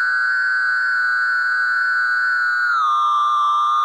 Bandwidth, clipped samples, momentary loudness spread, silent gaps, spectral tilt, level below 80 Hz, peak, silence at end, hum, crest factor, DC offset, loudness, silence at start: 11.5 kHz; under 0.1%; 1 LU; none; 5.5 dB/octave; under -90 dBFS; -12 dBFS; 0 s; none; 6 dB; under 0.1%; -17 LUFS; 0 s